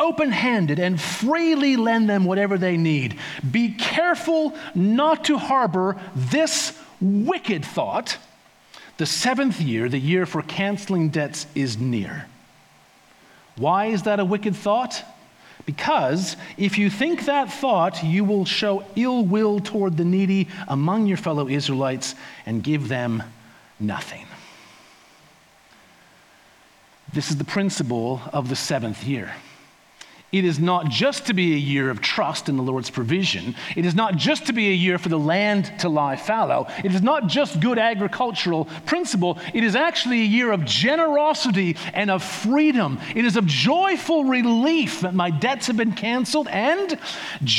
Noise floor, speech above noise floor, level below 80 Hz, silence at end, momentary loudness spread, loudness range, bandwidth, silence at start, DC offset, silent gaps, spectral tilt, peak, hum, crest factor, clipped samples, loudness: -54 dBFS; 32 dB; -68 dBFS; 0 s; 8 LU; 7 LU; 14.5 kHz; 0 s; under 0.1%; none; -5 dB/octave; -6 dBFS; none; 16 dB; under 0.1%; -21 LUFS